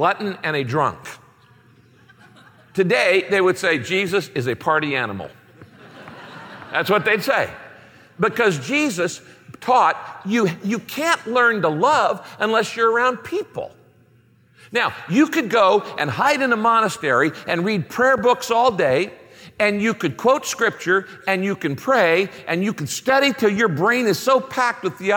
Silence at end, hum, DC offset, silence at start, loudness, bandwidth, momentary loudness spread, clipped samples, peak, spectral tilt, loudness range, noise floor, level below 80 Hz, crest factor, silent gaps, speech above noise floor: 0 s; none; under 0.1%; 0 s; -19 LUFS; 17 kHz; 10 LU; under 0.1%; -4 dBFS; -4.5 dB/octave; 4 LU; -55 dBFS; -64 dBFS; 16 dB; none; 36 dB